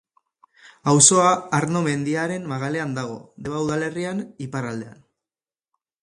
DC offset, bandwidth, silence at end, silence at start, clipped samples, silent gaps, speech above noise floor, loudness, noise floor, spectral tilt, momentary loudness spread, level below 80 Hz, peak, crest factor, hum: under 0.1%; 11.5 kHz; 1.1 s; 0.85 s; under 0.1%; none; over 68 dB; -21 LUFS; under -90 dBFS; -4 dB/octave; 18 LU; -62 dBFS; 0 dBFS; 22 dB; none